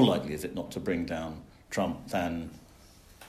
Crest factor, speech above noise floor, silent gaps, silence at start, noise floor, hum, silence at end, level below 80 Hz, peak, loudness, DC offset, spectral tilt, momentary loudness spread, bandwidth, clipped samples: 22 dB; 24 dB; none; 0 s; -55 dBFS; none; 0 s; -54 dBFS; -10 dBFS; -33 LUFS; under 0.1%; -5.5 dB/octave; 11 LU; 15 kHz; under 0.1%